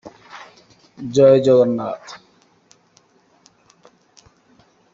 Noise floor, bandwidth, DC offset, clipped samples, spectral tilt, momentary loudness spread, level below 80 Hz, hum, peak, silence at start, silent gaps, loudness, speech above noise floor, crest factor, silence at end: -57 dBFS; 7.6 kHz; under 0.1%; under 0.1%; -7 dB/octave; 28 LU; -62 dBFS; none; -2 dBFS; 0.05 s; none; -15 LUFS; 42 dB; 18 dB; 2.8 s